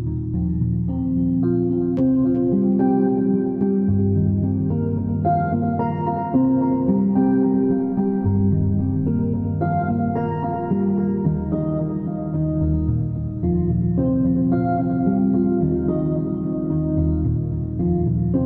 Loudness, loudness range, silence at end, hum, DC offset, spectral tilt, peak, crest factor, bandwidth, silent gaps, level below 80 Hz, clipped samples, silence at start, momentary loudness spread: -21 LUFS; 3 LU; 0 s; none; under 0.1%; -14 dB/octave; -8 dBFS; 12 dB; 3 kHz; none; -36 dBFS; under 0.1%; 0 s; 5 LU